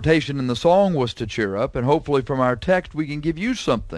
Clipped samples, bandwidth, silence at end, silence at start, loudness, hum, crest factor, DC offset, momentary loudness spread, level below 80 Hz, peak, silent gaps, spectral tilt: under 0.1%; 11 kHz; 0 s; 0 s; -21 LUFS; none; 16 dB; under 0.1%; 8 LU; -42 dBFS; -4 dBFS; none; -6.5 dB/octave